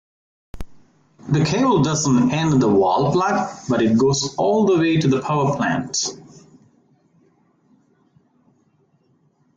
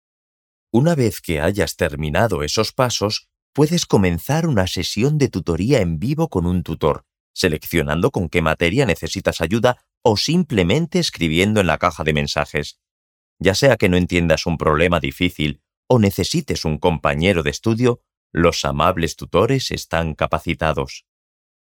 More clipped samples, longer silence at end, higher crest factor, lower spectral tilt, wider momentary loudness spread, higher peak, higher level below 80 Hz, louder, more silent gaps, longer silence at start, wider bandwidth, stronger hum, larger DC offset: neither; first, 3.4 s vs 0.65 s; about the same, 14 dB vs 18 dB; about the same, -5.5 dB/octave vs -5.5 dB/octave; about the same, 6 LU vs 6 LU; second, -6 dBFS vs -2 dBFS; second, -50 dBFS vs -38 dBFS; about the same, -18 LUFS vs -19 LUFS; second, none vs 3.42-3.53 s, 7.20-7.34 s, 9.97-10.01 s, 12.91-13.36 s, 15.77-15.83 s, 18.17-18.30 s; second, 0.55 s vs 0.75 s; second, 9.4 kHz vs 19 kHz; neither; neither